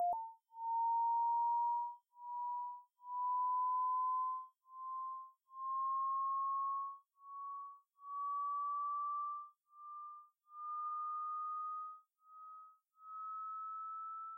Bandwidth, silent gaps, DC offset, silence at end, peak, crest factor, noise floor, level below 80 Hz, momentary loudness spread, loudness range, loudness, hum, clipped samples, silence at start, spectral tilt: 1.5 kHz; none; under 0.1%; 0 s; -32 dBFS; 10 dB; -61 dBFS; under -90 dBFS; 19 LU; 7 LU; -40 LUFS; none; under 0.1%; 0 s; -5 dB/octave